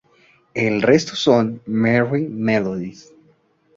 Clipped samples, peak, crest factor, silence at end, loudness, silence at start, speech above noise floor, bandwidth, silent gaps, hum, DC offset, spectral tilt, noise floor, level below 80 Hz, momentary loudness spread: under 0.1%; -2 dBFS; 18 dB; 0.85 s; -19 LUFS; 0.55 s; 40 dB; 7.8 kHz; none; none; under 0.1%; -6 dB/octave; -58 dBFS; -56 dBFS; 11 LU